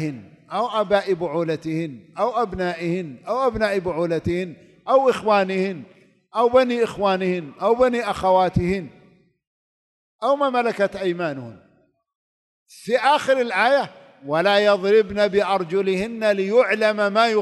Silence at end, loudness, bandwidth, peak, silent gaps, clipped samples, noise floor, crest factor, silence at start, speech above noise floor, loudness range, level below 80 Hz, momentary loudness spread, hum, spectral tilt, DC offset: 0 s; -21 LUFS; 12 kHz; -4 dBFS; 9.47-10.19 s, 12.15-12.66 s; under 0.1%; -61 dBFS; 18 dB; 0 s; 41 dB; 6 LU; -50 dBFS; 11 LU; none; -6 dB/octave; under 0.1%